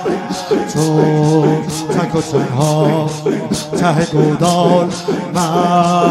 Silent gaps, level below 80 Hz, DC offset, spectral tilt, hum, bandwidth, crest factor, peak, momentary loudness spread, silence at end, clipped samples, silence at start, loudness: none; -48 dBFS; under 0.1%; -6 dB/octave; none; 14.5 kHz; 14 dB; 0 dBFS; 6 LU; 0 s; under 0.1%; 0 s; -14 LUFS